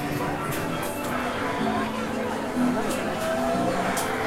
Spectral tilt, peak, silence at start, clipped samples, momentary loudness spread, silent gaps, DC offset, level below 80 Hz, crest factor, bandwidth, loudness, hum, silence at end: -4.5 dB/octave; -12 dBFS; 0 s; under 0.1%; 4 LU; none; under 0.1%; -48 dBFS; 14 dB; 16 kHz; -26 LUFS; none; 0 s